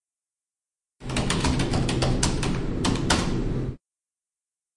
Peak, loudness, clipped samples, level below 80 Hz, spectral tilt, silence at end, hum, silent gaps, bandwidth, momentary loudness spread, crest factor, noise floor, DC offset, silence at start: -4 dBFS; -25 LUFS; under 0.1%; -34 dBFS; -4.5 dB/octave; 1 s; none; none; 11.5 kHz; 7 LU; 22 dB; under -90 dBFS; under 0.1%; 1 s